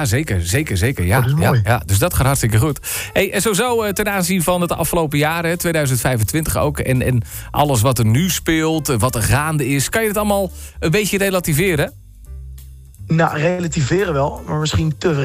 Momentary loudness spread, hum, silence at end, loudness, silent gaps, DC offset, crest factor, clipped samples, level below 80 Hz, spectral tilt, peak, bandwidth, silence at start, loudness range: 5 LU; none; 0 s; -17 LUFS; none; under 0.1%; 12 dB; under 0.1%; -34 dBFS; -5 dB/octave; -4 dBFS; 16 kHz; 0 s; 3 LU